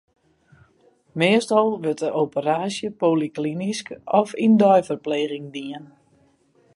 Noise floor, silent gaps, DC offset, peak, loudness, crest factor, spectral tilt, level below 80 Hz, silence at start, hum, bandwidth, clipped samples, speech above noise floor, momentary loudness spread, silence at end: -60 dBFS; none; under 0.1%; -4 dBFS; -21 LUFS; 20 dB; -5.5 dB/octave; -68 dBFS; 1.15 s; none; 11.5 kHz; under 0.1%; 39 dB; 15 LU; 0.9 s